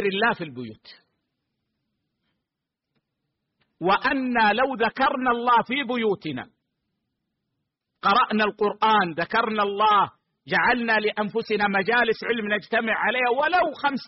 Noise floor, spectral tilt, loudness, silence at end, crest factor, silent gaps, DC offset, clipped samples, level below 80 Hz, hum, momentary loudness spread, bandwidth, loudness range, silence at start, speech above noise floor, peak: -84 dBFS; -2 dB/octave; -22 LUFS; 0 s; 14 dB; none; under 0.1%; under 0.1%; -60 dBFS; none; 7 LU; 5.8 kHz; 6 LU; 0 s; 62 dB; -10 dBFS